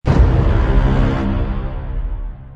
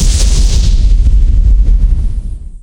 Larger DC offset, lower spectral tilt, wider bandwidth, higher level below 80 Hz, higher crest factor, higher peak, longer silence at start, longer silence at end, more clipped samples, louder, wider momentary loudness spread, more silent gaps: neither; first, -9 dB/octave vs -4.5 dB/octave; second, 6.4 kHz vs 11 kHz; second, -18 dBFS vs -8 dBFS; first, 14 dB vs 8 dB; about the same, -2 dBFS vs 0 dBFS; about the same, 0.05 s vs 0 s; about the same, 0 s vs 0.05 s; neither; second, -18 LUFS vs -12 LUFS; first, 12 LU vs 8 LU; neither